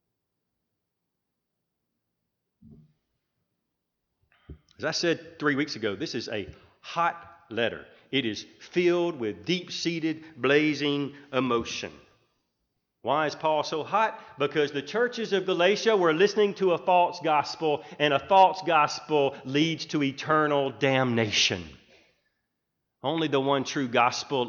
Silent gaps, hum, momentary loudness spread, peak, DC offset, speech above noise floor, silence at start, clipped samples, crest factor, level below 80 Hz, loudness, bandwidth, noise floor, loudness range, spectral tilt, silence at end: none; none; 10 LU; -6 dBFS; under 0.1%; 57 dB; 2.7 s; under 0.1%; 20 dB; -66 dBFS; -26 LUFS; 7.4 kHz; -83 dBFS; 7 LU; -4.5 dB/octave; 0 s